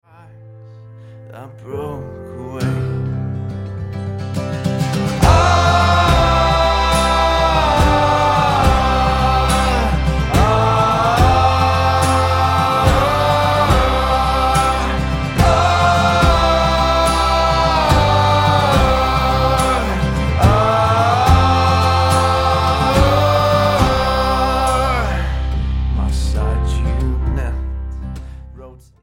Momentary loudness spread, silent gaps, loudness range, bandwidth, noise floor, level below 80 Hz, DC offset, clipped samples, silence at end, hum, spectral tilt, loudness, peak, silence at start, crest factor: 11 LU; none; 8 LU; 16.5 kHz; -40 dBFS; -22 dBFS; under 0.1%; under 0.1%; 0.3 s; none; -5.5 dB/octave; -15 LUFS; 0 dBFS; 0.4 s; 14 dB